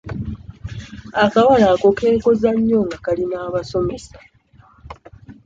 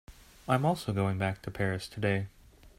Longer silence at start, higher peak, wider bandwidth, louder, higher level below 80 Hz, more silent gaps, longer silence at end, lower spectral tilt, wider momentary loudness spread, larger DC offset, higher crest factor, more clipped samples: about the same, 0.05 s vs 0.1 s; first, -2 dBFS vs -14 dBFS; second, 7.8 kHz vs 15.5 kHz; first, -17 LUFS vs -31 LUFS; first, -42 dBFS vs -56 dBFS; neither; about the same, 0.1 s vs 0.1 s; about the same, -6.5 dB/octave vs -6.5 dB/octave; first, 20 LU vs 6 LU; neither; about the same, 16 dB vs 18 dB; neither